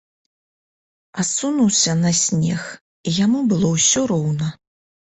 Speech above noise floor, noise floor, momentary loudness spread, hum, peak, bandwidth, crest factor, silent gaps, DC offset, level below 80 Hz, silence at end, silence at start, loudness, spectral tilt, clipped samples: over 72 dB; under -90 dBFS; 12 LU; none; -4 dBFS; 8.4 kHz; 16 dB; 2.81-3.04 s; under 0.1%; -54 dBFS; 0.5 s; 1.15 s; -18 LUFS; -4 dB/octave; under 0.1%